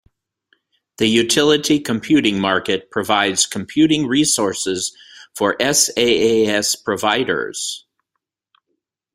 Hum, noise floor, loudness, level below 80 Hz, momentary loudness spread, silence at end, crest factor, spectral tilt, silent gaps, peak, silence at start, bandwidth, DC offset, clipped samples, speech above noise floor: none; -78 dBFS; -17 LUFS; -56 dBFS; 7 LU; 1.35 s; 18 dB; -3 dB/octave; none; 0 dBFS; 1 s; 16 kHz; under 0.1%; under 0.1%; 61 dB